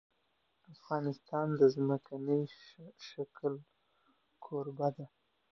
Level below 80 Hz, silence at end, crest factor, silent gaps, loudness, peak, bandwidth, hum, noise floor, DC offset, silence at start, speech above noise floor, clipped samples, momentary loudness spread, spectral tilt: -82 dBFS; 0.5 s; 22 dB; none; -35 LUFS; -14 dBFS; 6.4 kHz; none; -78 dBFS; under 0.1%; 0.7 s; 43 dB; under 0.1%; 22 LU; -7.5 dB/octave